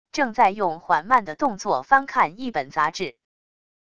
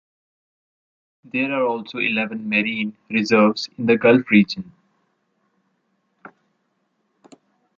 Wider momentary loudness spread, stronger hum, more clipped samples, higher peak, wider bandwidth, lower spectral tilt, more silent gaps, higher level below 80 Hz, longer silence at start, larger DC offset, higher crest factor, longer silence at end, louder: second, 7 LU vs 10 LU; neither; neither; about the same, -4 dBFS vs -2 dBFS; first, 9.6 kHz vs 7.4 kHz; second, -4 dB/octave vs -6 dB/octave; neither; first, -60 dBFS vs -66 dBFS; second, 0.15 s vs 1.35 s; first, 0.5% vs under 0.1%; about the same, 20 dB vs 20 dB; second, 0.8 s vs 3.15 s; second, -22 LUFS vs -19 LUFS